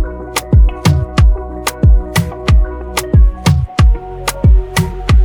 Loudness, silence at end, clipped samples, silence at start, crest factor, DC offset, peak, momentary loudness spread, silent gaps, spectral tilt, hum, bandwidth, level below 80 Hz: -13 LUFS; 0 s; under 0.1%; 0 s; 10 dB; under 0.1%; 0 dBFS; 7 LU; none; -5.5 dB/octave; none; 19 kHz; -14 dBFS